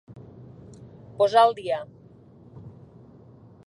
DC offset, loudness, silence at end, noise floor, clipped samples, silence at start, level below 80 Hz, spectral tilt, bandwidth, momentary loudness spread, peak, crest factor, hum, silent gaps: under 0.1%; -22 LUFS; 0.95 s; -51 dBFS; under 0.1%; 0.1 s; -62 dBFS; -5 dB/octave; 11.5 kHz; 28 LU; -6 dBFS; 22 dB; none; none